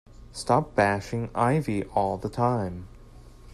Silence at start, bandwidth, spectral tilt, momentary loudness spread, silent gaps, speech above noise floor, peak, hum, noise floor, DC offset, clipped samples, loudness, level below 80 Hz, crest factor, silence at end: 0.1 s; 13 kHz; -6.5 dB/octave; 11 LU; none; 22 dB; -8 dBFS; none; -48 dBFS; under 0.1%; under 0.1%; -26 LUFS; -48 dBFS; 20 dB; 0 s